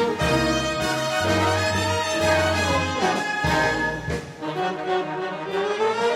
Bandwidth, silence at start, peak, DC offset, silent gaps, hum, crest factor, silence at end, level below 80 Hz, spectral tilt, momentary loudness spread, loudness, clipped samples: 16 kHz; 0 s; -8 dBFS; under 0.1%; none; none; 14 dB; 0 s; -42 dBFS; -4 dB/octave; 7 LU; -23 LUFS; under 0.1%